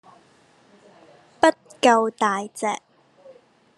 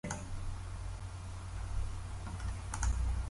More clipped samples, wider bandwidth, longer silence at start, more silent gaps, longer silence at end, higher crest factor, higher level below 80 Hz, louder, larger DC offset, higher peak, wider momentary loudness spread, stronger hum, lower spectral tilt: neither; about the same, 12 kHz vs 11.5 kHz; first, 1.4 s vs 0.05 s; neither; first, 1 s vs 0 s; first, 24 dB vs 18 dB; second, -72 dBFS vs -40 dBFS; first, -21 LUFS vs -41 LUFS; neither; first, -2 dBFS vs -20 dBFS; about the same, 10 LU vs 8 LU; neither; second, -3 dB/octave vs -5 dB/octave